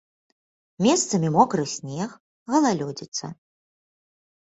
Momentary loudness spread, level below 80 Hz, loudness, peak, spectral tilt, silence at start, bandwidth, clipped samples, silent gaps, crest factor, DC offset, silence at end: 12 LU; -64 dBFS; -23 LUFS; -4 dBFS; -4.5 dB/octave; 0.8 s; 8.2 kHz; under 0.1%; 2.20-2.46 s, 3.08-3.12 s; 20 dB; under 0.1%; 1.15 s